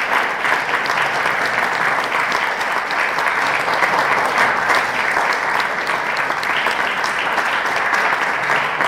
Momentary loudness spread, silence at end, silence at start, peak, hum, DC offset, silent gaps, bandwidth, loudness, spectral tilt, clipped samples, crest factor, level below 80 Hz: 3 LU; 0 s; 0 s; 0 dBFS; none; 0.1%; none; 16.5 kHz; -17 LUFS; -2 dB/octave; under 0.1%; 18 dB; -56 dBFS